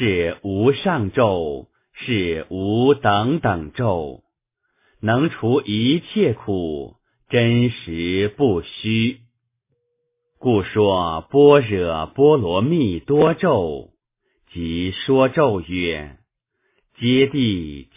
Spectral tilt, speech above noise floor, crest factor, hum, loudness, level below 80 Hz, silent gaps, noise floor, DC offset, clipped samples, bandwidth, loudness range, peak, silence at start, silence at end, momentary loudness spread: -11 dB/octave; 55 dB; 18 dB; none; -19 LUFS; -44 dBFS; none; -74 dBFS; under 0.1%; under 0.1%; 3.8 kHz; 5 LU; 0 dBFS; 0 s; 0.15 s; 11 LU